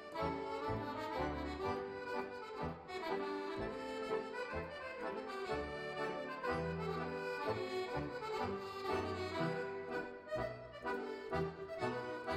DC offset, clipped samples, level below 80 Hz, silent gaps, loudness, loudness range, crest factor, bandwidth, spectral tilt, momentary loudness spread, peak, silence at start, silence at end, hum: under 0.1%; under 0.1%; -60 dBFS; none; -42 LUFS; 2 LU; 16 dB; 15 kHz; -6 dB/octave; 4 LU; -24 dBFS; 0 s; 0 s; none